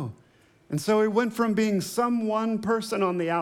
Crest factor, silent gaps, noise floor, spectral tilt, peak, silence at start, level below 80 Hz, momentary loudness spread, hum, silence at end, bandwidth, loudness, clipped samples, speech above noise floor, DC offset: 14 dB; none; -59 dBFS; -5.5 dB/octave; -10 dBFS; 0 s; -68 dBFS; 5 LU; none; 0 s; 17 kHz; -25 LUFS; under 0.1%; 35 dB; under 0.1%